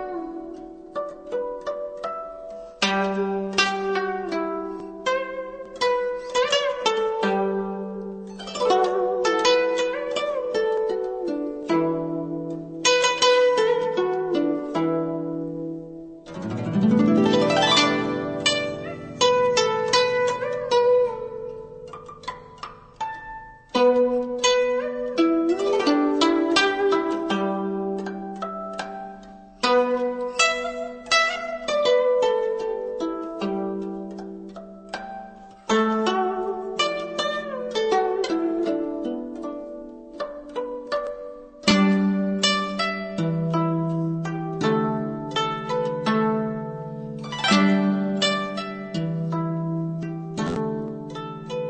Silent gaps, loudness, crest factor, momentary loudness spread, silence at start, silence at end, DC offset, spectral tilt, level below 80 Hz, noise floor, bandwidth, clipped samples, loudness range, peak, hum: none; -23 LUFS; 20 dB; 16 LU; 0 s; 0 s; under 0.1%; -4.5 dB/octave; -58 dBFS; -43 dBFS; 9 kHz; under 0.1%; 6 LU; -4 dBFS; none